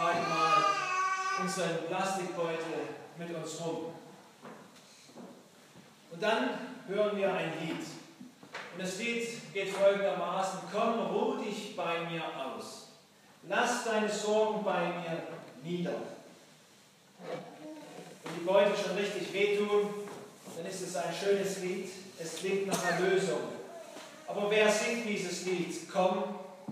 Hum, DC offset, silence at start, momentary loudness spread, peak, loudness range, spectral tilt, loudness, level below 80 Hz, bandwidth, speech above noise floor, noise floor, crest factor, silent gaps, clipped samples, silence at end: none; under 0.1%; 0 s; 19 LU; -14 dBFS; 7 LU; -4 dB/octave; -33 LUFS; under -90 dBFS; 15.5 kHz; 28 dB; -60 dBFS; 20 dB; none; under 0.1%; 0 s